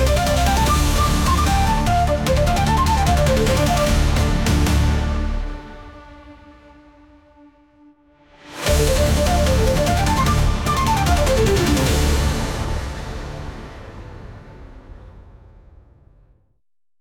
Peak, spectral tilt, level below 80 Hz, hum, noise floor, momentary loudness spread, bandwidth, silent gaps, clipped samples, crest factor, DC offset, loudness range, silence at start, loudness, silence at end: -6 dBFS; -5 dB/octave; -24 dBFS; none; -69 dBFS; 18 LU; 18.5 kHz; none; under 0.1%; 14 dB; under 0.1%; 15 LU; 0 s; -18 LUFS; 1.8 s